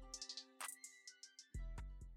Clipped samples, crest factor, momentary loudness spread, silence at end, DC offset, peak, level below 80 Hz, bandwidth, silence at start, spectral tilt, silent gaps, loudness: under 0.1%; 18 dB; 8 LU; 0 s; under 0.1%; -36 dBFS; -56 dBFS; 16.5 kHz; 0 s; -2 dB/octave; none; -53 LUFS